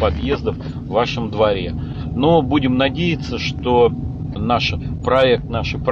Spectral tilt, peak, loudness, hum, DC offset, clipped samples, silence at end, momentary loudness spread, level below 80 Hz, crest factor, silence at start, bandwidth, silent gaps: -7 dB/octave; -2 dBFS; -18 LUFS; none; under 0.1%; under 0.1%; 0 s; 10 LU; -34 dBFS; 14 dB; 0 s; 7.2 kHz; none